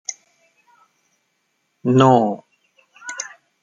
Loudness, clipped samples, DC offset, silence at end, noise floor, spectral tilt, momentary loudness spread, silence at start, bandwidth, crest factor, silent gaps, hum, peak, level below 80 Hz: -18 LUFS; under 0.1%; under 0.1%; 0.35 s; -70 dBFS; -6 dB/octave; 20 LU; 0.1 s; 9.2 kHz; 22 dB; none; none; 0 dBFS; -64 dBFS